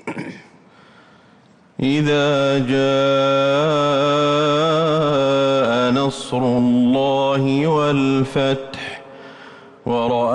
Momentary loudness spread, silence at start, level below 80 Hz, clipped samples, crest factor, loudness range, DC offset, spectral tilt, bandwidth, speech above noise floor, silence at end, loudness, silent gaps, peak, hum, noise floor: 13 LU; 0.05 s; -54 dBFS; under 0.1%; 10 dB; 3 LU; under 0.1%; -6 dB/octave; 10.5 kHz; 34 dB; 0 s; -17 LUFS; none; -8 dBFS; none; -50 dBFS